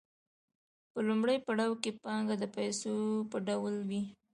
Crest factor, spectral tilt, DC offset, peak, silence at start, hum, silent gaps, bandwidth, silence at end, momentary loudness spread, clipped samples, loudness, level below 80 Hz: 18 dB; -5 dB/octave; under 0.1%; -18 dBFS; 0.95 s; none; none; 11 kHz; 0.2 s; 6 LU; under 0.1%; -35 LUFS; -78 dBFS